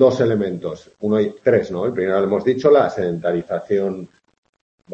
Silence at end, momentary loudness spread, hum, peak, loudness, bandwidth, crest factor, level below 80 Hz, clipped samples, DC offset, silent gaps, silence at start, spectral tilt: 0 s; 11 LU; none; -2 dBFS; -19 LUFS; 7.8 kHz; 16 dB; -58 dBFS; under 0.1%; under 0.1%; 4.38-4.43 s, 4.49-4.53 s, 4.61-4.78 s; 0 s; -7.5 dB/octave